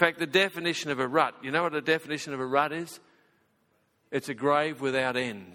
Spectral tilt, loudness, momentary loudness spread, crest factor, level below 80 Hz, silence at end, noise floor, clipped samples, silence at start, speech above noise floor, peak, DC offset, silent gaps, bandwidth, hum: -4 dB/octave; -28 LUFS; 9 LU; 26 dB; -72 dBFS; 0 s; -70 dBFS; under 0.1%; 0 s; 42 dB; -4 dBFS; under 0.1%; none; 17.5 kHz; none